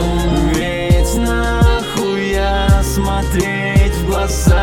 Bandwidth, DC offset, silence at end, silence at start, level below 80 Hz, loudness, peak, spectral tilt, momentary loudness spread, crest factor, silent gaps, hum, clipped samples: 17.5 kHz; under 0.1%; 0 s; 0 s; -18 dBFS; -15 LUFS; 0 dBFS; -5.5 dB/octave; 3 LU; 12 dB; none; none; under 0.1%